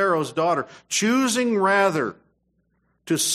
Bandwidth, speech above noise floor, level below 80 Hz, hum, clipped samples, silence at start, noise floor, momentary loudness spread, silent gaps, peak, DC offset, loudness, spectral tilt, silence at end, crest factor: 15 kHz; 47 dB; -70 dBFS; none; under 0.1%; 0 s; -69 dBFS; 8 LU; none; -6 dBFS; under 0.1%; -22 LUFS; -3 dB/octave; 0 s; 16 dB